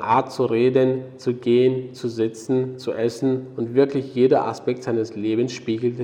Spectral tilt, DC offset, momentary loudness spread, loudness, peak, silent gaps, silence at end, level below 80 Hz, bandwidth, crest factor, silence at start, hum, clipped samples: -7 dB/octave; under 0.1%; 8 LU; -22 LUFS; -6 dBFS; none; 0 s; -66 dBFS; 10 kHz; 16 dB; 0 s; none; under 0.1%